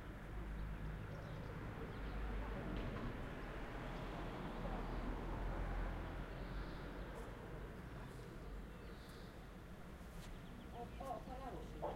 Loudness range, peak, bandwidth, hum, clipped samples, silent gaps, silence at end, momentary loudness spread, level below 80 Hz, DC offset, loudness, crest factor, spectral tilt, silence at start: 6 LU; -32 dBFS; 16 kHz; none; under 0.1%; none; 0 s; 8 LU; -50 dBFS; under 0.1%; -50 LUFS; 14 dB; -7 dB/octave; 0 s